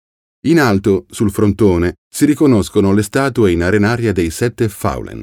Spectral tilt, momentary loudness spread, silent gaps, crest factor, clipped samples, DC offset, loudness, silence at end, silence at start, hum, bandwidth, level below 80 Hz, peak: -6.5 dB/octave; 6 LU; 1.98-2.11 s; 12 dB; under 0.1%; under 0.1%; -14 LUFS; 0 s; 0.45 s; none; 17 kHz; -36 dBFS; -2 dBFS